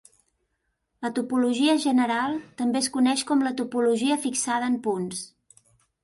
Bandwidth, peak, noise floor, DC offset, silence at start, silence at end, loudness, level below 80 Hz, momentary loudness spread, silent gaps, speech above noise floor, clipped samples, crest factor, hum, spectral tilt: 11.5 kHz; -10 dBFS; -76 dBFS; under 0.1%; 1 s; 0.75 s; -24 LUFS; -70 dBFS; 8 LU; none; 52 dB; under 0.1%; 16 dB; none; -3.5 dB/octave